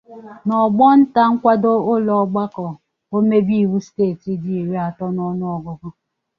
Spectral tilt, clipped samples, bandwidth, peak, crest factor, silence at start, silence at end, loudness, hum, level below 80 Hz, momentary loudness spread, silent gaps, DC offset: -9 dB/octave; under 0.1%; 6.6 kHz; -2 dBFS; 16 dB; 0.1 s; 0.5 s; -17 LUFS; none; -60 dBFS; 15 LU; none; under 0.1%